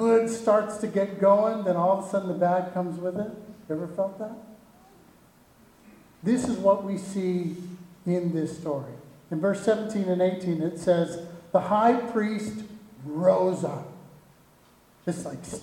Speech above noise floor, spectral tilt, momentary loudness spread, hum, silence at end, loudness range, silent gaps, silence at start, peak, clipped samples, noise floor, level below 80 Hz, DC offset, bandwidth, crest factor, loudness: 32 dB; -7 dB/octave; 16 LU; none; 0 s; 6 LU; none; 0 s; -8 dBFS; under 0.1%; -58 dBFS; -66 dBFS; under 0.1%; 16 kHz; 20 dB; -26 LUFS